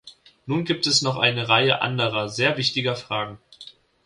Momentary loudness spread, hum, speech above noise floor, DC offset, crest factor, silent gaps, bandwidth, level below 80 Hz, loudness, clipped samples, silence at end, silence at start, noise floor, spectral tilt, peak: 10 LU; none; 25 dB; under 0.1%; 20 dB; none; 11.5 kHz; -60 dBFS; -21 LUFS; under 0.1%; 0.35 s; 0.05 s; -47 dBFS; -3.5 dB/octave; -4 dBFS